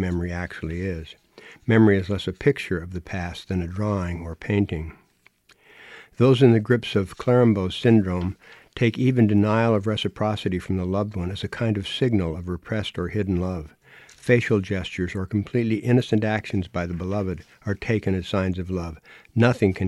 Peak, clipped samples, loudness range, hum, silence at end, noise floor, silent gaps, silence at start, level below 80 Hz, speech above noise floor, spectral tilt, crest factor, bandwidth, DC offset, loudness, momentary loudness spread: -4 dBFS; under 0.1%; 6 LU; none; 0 s; -58 dBFS; none; 0 s; -46 dBFS; 36 dB; -7.5 dB/octave; 20 dB; 12 kHz; under 0.1%; -23 LUFS; 13 LU